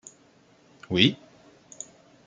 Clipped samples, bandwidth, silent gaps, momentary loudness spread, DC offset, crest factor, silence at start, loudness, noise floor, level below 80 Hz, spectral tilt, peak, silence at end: under 0.1%; 9.4 kHz; none; 21 LU; under 0.1%; 28 dB; 0.9 s; -23 LUFS; -59 dBFS; -66 dBFS; -4.5 dB/octave; -2 dBFS; 1.1 s